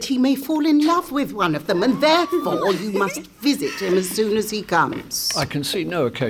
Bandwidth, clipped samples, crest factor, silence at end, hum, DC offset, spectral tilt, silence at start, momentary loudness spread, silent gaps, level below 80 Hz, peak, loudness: 20 kHz; under 0.1%; 16 dB; 0 s; none; under 0.1%; -4 dB/octave; 0 s; 6 LU; none; -54 dBFS; -4 dBFS; -20 LUFS